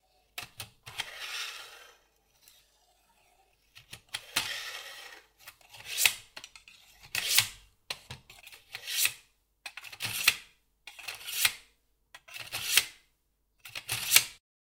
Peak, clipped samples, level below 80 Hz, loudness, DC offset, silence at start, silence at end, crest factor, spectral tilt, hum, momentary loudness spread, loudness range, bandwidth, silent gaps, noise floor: 0 dBFS; under 0.1%; -70 dBFS; -30 LUFS; under 0.1%; 0.35 s; 0.3 s; 34 dB; 1.5 dB/octave; none; 24 LU; 12 LU; 18 kHz; none; -75 dBFS